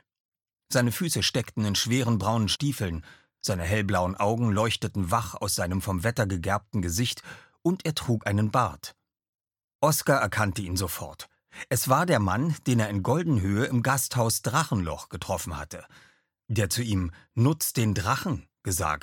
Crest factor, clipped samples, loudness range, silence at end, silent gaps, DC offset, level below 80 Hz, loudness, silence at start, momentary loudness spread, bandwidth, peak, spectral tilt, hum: 20 dB; under 0.1%; 3 LU; 0 s; 9.29-9.33 s, 9.64-9.68 s, 9.75-9.79 s; under 0.1%; -50 dBFS; -27 LUFS; 0.7 s; 10 LU; 17.5 kHz; -6 dBFS; -4.5 dB/octave; none